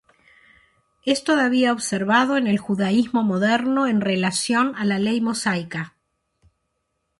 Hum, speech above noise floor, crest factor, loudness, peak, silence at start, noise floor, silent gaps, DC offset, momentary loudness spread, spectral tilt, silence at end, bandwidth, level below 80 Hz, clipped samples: none; 54 dB; 18 dB; -21 LUFS; -4 dBFS; 1.05 s; -75 dBFS; none; under 0.1%; 6 LU; -4.5 dB/octave; 1.3 s; 11.5 kHz; -62 dBFS; under 0.1%